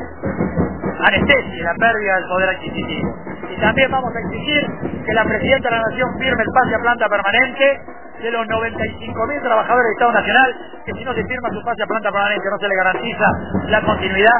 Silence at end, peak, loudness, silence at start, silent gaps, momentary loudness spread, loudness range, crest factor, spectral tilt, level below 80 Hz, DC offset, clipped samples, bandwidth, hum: 0 s; 0 dBFS; -17 LUFS; 0 s; none; 10 LU; 2 LU; 18 dB; -8.5 dB/octave; -38 dBFS; 1%; under 0.1%; 4 kHz; none